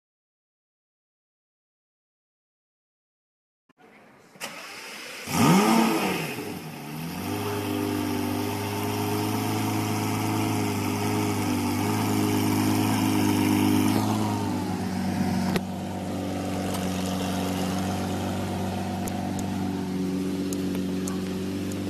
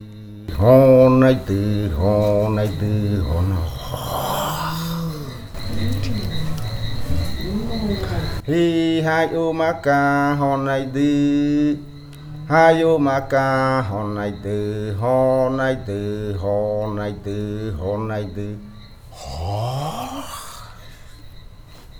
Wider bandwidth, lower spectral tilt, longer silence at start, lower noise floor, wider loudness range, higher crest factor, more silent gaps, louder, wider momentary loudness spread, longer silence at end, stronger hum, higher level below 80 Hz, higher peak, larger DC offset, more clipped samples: second, 14 kHz vs over 20 kHz; second, -5.5 dB/octave vs -7 dB/octave; first, 4.4 s vs 0 s; first, -53 dBFS vs -40 dBFS; second, 5 LU vs 9 LU; about the same, 20 dB vs 18 dB; neither; second, -26 LUFS vs -20 LUFS; second, 10 LU vs 15 LU; about the same, 0 s vs 0 s; neither; second, -58 dBFS vs -36 dBFS; second, -8 dBFS vs -2 dBFS; neither; neither